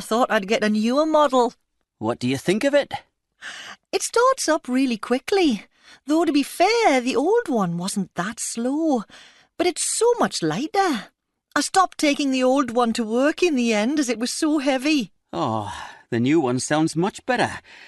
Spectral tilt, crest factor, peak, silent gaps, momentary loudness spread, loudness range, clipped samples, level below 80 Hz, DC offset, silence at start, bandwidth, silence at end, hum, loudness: -4 dB/octave; 16 dB; -4 dBFS; none; 9 LU; 2 LU; under 0.1%; -60 dBFS; under 0.1%; 0 s; 12.5 kHz; 0.05 s; none; -21 LUFS